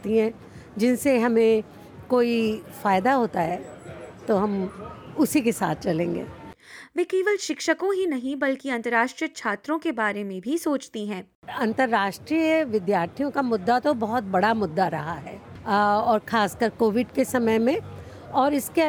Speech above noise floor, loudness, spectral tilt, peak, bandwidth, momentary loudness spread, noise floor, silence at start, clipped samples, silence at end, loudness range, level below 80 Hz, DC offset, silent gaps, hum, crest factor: 21 dB; -24 LUFS; -5 dB/octave; -8 dBFS; over 20 kHz; 14 LU; -45 dBFS; 0 s; under 0.1%; 0 s; 3 LU; -60 dBFS; under 0.1%; 11.35-11.42 s; none; 16 dB